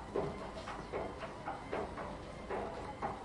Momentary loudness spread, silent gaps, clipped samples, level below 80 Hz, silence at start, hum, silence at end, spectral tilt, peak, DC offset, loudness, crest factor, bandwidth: 4 LU; none; under 0.1%; -56 dBFS; 0 s; none; 0 s; -6 dB/octave; -24 dBFS; under 0.1%; -43 LUFS; 18 dB; 11.5 kHz